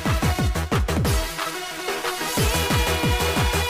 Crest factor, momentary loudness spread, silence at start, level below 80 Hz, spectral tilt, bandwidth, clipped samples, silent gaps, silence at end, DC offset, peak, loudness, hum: 12 dB; 7 LU; 0 s; -28 dBFS; -4 dB/octave; 16 kHz; under 0.1%; none; 0 s; under 0.1%; -10 dBFS; -23 LUFS; none